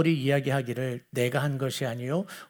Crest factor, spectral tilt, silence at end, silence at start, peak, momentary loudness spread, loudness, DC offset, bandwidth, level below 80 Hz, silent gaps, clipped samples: 16 dB; -6 dB/octave; 0.05 s; 0 s; -10 dBFS; 6 LU; -28 LUFS; under 0.1%; over 20 kHz; -72 dBFS; none; under 0.1%